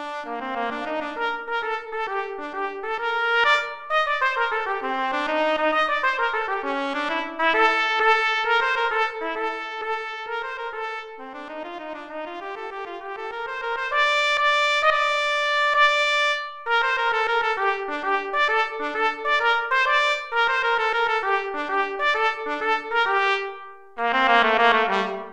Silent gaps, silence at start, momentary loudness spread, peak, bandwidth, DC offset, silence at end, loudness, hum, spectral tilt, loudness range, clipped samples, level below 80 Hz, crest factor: none; 0 s; 13 LU; -4 dBFS; 12.5 kHz; under 0.1%; 0 s; -22 LUFS; none; -2 dB/octave; 8 LU; under 0.1%; -58 dBFS; 20 dB